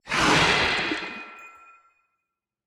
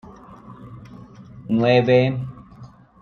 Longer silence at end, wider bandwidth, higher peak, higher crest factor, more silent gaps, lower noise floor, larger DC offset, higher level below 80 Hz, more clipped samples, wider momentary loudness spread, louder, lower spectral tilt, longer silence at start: first, 1.15 s vs 0.35 s; first, 17 kHz vs 6.6 kHz; about the same, -6 dBFS vs -4 dBFS; about the same, 20 dB vs 18 dB; neither; first, -84 dBFS vs -44 dBFS; neither; first, -48 dBFS vs -54 dBFS; neither; second, 19 LU vs 26 LU; second, -21 LUFS vs -18 LUFS; second, -3 dB/octave vs -8.5 dB/octave; second, 0.05 s vs 0.3 s